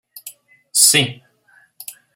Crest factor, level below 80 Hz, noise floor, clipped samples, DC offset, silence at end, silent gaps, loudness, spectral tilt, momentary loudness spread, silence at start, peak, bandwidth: 20 dB; -66 dBFS; -55 dBFS; under 0.1%; under 0.1%; 0.25 s; none; -13 LUFS; -1 dB/octave; 25 LU; 0.25 s; 0 dBFS; 16.5 kHz